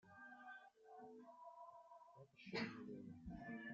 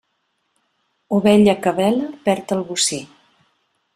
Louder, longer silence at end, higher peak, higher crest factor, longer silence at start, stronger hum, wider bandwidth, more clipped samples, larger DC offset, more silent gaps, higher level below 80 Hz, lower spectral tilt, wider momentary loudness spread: second, -55 LUFS vs -18 LUFS; second, 0 s vs 0.9 s; second, -32 dBFS vs -2 dBFS; first, 24 dB vs 18 dB; second, 0.05 s vs 1.1 s; neither; second, 7.4 kHz vs 14 kHz; neither; neither; neither; second, -74 dBFS vs -56 dBFS; about the same, -3.5 dB/octave vs -4.5 dB/octave; first, 16 LU vs 9 LU